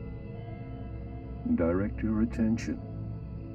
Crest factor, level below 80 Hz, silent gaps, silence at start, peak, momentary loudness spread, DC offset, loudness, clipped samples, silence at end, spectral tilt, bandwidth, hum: 18 dB; -42 dBFS; none; 0 s; -14 dBFS; 13 LU; under 0.1%; -33 LUFS; under 0.1%; 0 s; -8.5 dB/octave; 8 kHz; none